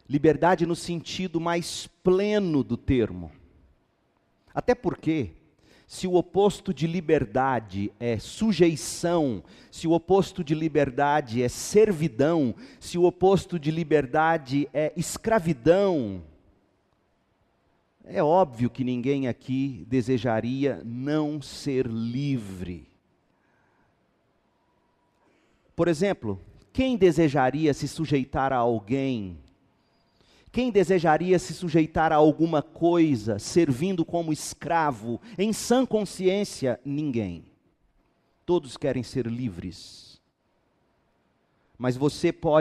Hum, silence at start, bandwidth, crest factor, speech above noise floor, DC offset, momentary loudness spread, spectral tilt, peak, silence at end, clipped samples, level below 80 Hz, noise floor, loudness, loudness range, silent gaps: none; 0.1 s; 13.5 kHz; 20 dB; 46 dB; under 0.1%; 12 LU; -6 dB/octave; -6 dBFS; 0 s; under 0.1%; -52 dBFS; -70 dBFS; -25 LUFS; 9 LU; none